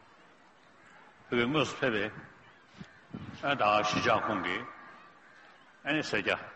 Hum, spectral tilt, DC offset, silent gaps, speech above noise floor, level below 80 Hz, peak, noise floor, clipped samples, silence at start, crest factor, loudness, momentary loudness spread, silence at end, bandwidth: none; -4.5 dB/octave; under 0.1%; none; 30 dB; -66 dBFS; -14 dBFS; -60 dBFS; under 0.1%; 1.3 s; 20 dB; -30 LUFS; 23 LU; 0 s; 8.4 kHz